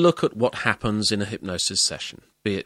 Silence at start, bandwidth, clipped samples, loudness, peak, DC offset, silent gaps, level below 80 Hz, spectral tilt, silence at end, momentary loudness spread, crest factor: 0 s; 13.5 kHz; under 0.1%; -23 LUFS; -2 dBFS; under 0.1%; none; -52 dBFS; -3.5 dB/octave; 0.05 s; 10 LU; 22 dB